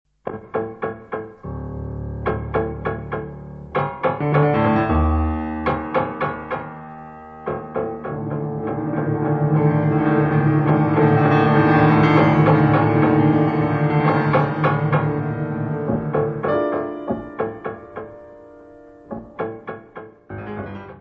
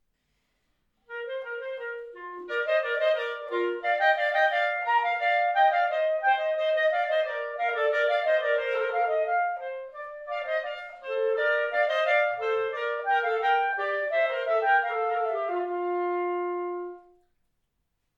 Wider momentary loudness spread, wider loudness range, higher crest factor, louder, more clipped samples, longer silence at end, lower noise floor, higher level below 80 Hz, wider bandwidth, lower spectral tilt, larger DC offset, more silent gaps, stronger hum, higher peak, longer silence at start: first, 19 LU vs 12 LU; first, 12 LU vs 5 LU; about the same, 18 dB vs 16 dB; first, -20 LUFS vs -26 LUFS; neither; second, 0 s vs 1.15 s; second, -44 dBFS vs -77 dBFS; first, -36 dBFS vs -74 dBFS; second, 4.9 kHz vs 7.4 kHz; first, -10 dB/octave vs -2.5 dB/octave; neither; neither; neither; first, -2 dBFS vs -10 dBFS; second, 0.25 s vs 1.1 s